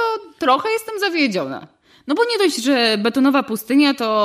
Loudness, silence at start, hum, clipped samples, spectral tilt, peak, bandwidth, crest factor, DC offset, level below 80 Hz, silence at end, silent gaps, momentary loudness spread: -18 LUFS; 0 s; none; under 0.1%; -3.5 dB/octave; -4 dBFS; 15.5 kHz; 14 dB; under 0.1%; -66 dBFS; 0 s; none; 8 LU